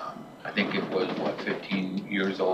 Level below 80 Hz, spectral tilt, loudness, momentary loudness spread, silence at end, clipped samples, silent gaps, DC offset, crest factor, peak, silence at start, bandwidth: -70 dBFS; -6.5 dB/octave; -30 LUFS; 5 LU; 0 s; under 0.1%; none; under 0.1%; 18 dB; -12 dBFS; 0 s; 12.5 kHz